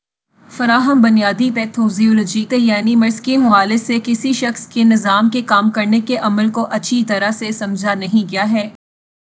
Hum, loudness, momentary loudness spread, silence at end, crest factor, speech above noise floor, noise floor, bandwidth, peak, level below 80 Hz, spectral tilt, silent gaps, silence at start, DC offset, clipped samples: none; -15 LUFS; 7 LU; 0.65 s; 14 dB; 36 dB; -50 dBFS; 8 kHz; 0 dBFS; -64 dBFS; -5 dB/octave; none; 0.5 s; under 0.1%; under 0.1%